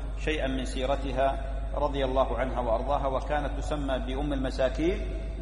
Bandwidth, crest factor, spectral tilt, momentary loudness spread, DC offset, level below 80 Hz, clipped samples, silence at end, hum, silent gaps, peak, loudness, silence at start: 10.5 kHz; 18 dB; -6.5 dB/octave; 5 LU; under 0.1%; -32 dBFS; under 0.1%; 0 s; none; none; -10 dBFS; -30 LUFS; 0 s